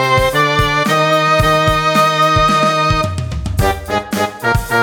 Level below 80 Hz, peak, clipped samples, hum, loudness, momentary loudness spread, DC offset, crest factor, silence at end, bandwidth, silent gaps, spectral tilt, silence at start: -28 dBFS; 0 dBFS; under 0.1%; none; -13 LUFS; 8 LU; under 0.1%; 12 dB; 0 s; 19.5 kHz; none; -4.5 dB/octave; 0 s